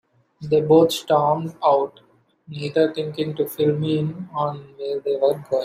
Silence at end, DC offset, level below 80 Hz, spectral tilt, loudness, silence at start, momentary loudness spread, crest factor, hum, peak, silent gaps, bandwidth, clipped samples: 0 s; under 0.1%; -64 dBFS; -6.5 dB/octave; -21 LUFS; 0.4 s; 13 LU; 18 dB; none; -4 dBFS; none; 15.5 kHz; under 0.1%